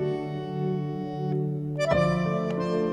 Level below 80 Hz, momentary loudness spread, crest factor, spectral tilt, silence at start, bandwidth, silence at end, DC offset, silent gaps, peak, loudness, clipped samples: -50 dBFS; 8 LU; 18 dB; -7.5 dB/octave; 0 s; 10 kHz; 0 s; under 0.1%; none; -10 dBFS; -28 LUFS; under 0.1%